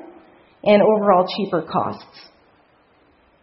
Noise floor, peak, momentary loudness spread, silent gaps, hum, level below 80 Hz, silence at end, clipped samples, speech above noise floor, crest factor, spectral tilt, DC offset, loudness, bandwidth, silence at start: -57 dBFS; -2 dBFS; 12 LU; none; none; -62 dBFS; 1.4 s; under 0.1%; 39 dB; 20 dB; -10.5 dB/octave; under 0.1%; -18 LUFS; 5.8 kHz; 0.65 s